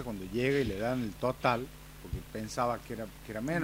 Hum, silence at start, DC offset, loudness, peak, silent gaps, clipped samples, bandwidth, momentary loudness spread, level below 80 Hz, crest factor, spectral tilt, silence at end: none; 0 s; under 0.1%; -34 LUFS; -14 dBFS; none; under 0.1%; 16 kHz; 13 LU; -50 dBFS; 20 dB; -6 dB/octave; 0 s